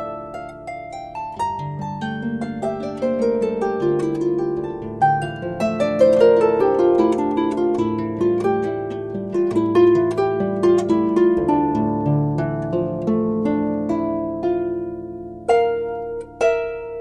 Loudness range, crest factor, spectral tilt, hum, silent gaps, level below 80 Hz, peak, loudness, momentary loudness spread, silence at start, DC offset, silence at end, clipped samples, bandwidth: 5 LU; 16 dB; -8 dB/octave; none; none; -48 dBFS; -2 dBFS; -20 LUFS; 13 LU; 0 s; under 0.1%; 0 s; under 0.1%; 9.8 kHz